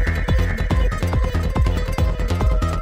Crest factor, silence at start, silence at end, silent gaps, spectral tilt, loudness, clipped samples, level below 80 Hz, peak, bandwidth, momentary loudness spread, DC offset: 12 dB; 0 s; 0 s; none; -6.5 dB/octave; -21 LUFS; under 0.1%; -20 dBFS; -6 dBFS; 15.5 kHz; 1 LU; under 0.1%